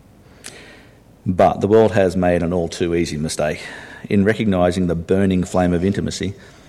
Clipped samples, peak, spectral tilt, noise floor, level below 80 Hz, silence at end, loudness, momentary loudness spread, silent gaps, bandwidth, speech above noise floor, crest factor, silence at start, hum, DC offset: under 0.1%; -2 dBFS; -6.5 dB/octave; -46 dBFS; -42 dBFS; 0.3 s; -18 LUFS; 16 LU; none; 13 kHz; 29 dB; 16 dB; 0.45 s; none; under 0.1%